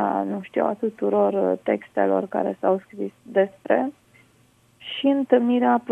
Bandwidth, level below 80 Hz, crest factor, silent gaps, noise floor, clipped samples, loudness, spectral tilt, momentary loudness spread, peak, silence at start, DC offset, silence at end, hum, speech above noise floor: 8.4 kHz; -72 dBFS; 20 dB; none; -59 dBFS; under 0.1%; -23 LUFS; -7.5 dB/octave; 8 LU; -4 dBFS; 0 s; under 0.1%; 0 s; none; 37 dB